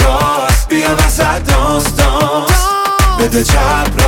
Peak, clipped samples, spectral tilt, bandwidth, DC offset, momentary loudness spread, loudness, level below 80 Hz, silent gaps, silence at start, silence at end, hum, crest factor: 0 dBFS; under 0.1%; -4.5 dB/octave; 18 kHz; under 0.1%; 2 LU; -12 LUFS; -16 dBFS; none; 0 s; 0 s; none; 10 dB